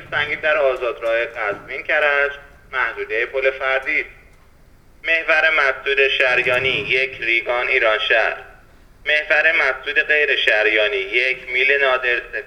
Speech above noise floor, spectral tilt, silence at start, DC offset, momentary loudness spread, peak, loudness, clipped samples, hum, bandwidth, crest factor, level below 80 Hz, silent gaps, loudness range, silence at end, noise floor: 30 dB; -3.5 dB/octave; 0 s; under 0.1%; 8 LU; 0 dBFS; -17 LUFS; under 0.1%; none; 12.5 kHz; 20 dB; -50 dBFS; none; 5 LU; 0 s; -48 dBFS